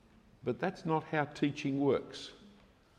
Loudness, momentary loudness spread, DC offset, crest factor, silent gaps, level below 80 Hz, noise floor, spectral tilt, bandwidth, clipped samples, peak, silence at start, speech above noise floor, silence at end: -34 LUFS; 14 LU; under 0.1%; 18 dB; none; -70 dBFS; -62 dBFS; -6.5 dB/octave; 10 kHz; under 0.1%; -18 dBFS; 0.45 s; 28 dB; 0.5 s